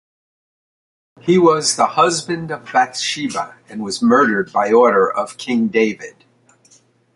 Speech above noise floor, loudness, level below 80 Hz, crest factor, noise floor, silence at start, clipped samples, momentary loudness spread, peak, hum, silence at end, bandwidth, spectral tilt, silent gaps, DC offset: 37 dB; -16 LUFS; -62 dBFS; 16 dB; -53 dBFS; 1.25 s; under 0.1%; 13 LU; -2 dBFS; none; 1.05 s; 11.5 kHz; -4 dB/octave; none; under 0.1%